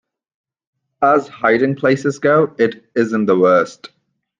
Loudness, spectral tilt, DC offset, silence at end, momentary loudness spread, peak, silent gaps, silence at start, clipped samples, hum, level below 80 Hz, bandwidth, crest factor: -16 LUFS; -6.5 dB/octave; under 0.1%; 0.65 s; 5 LU; -2 dBFS; none; 1 s; under 0.1%; none; -62 dBFS; 9.4 kHz; 16 dB